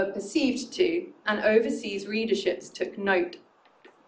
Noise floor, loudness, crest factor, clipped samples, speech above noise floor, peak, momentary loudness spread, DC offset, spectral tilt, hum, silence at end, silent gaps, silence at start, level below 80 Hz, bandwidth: -57 dBFS; -27 LUFS; 18 dB; under 0.1%; 30 dB; -10 dBFS; 9 LU; under 0.1%; -4 dB/octave; none; 0.7 s; none; 0 s; -66 dBFS; 9.6 kHz